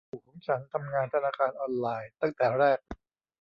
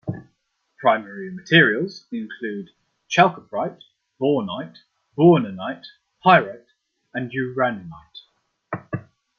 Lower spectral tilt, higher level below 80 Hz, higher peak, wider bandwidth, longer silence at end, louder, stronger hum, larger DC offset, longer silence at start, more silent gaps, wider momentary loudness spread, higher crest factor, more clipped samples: first, -8.5 dB/octave vs -6 dB/octave; about the same, -62 dBFS vs -64 dBFS; second, -12 dBFS vs -2 dBFS; second, 6 kHz vs 6.8 kHz; about the same, 0.45 s vs 0.4 s; second, -29 LUFS vs -20 LUFS; neither; neither; about the same, 0.15 s vs 0.05 s; neither; second, 15 LU vs 19 LU; about the same, 18 dB vs 20 dB; neither